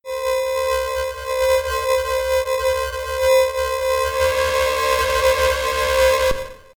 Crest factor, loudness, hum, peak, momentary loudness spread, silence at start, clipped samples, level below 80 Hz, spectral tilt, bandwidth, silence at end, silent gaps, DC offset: 14 dB; -19 LUFS; none; -6 dBFS; 6 LU; 0.05 s; under 0.1%; -36 dBFS; -2 dB/octave; 19 kHz; 0.2 s; none; under 0.1%